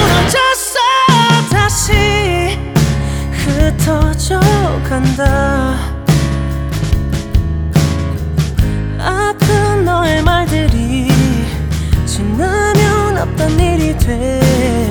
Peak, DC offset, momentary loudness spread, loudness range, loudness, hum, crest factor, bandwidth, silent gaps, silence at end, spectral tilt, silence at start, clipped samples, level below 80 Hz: 0 dBFS; under 0.1%; 6 LU; 3 LU; -13 LUFS; none; 12 dB; over 20 kHz; none; 0 s; -5 dB/octave; 0 s; under 0.1%; -20 dBFS